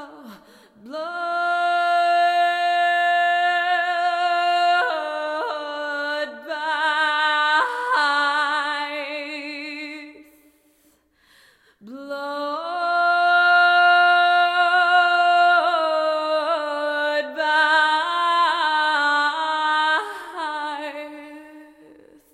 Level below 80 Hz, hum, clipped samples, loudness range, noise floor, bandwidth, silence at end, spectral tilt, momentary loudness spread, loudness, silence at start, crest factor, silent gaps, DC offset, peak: -76 dBFS; none; under 0.1%; 10 LU; -61 dBFS; 10.5 kHz; 0.7 s; -1 dB/octave; 14 LU; -20 LUFS; 0 s; 16 dB; none; under 0.1%; -6 dBFS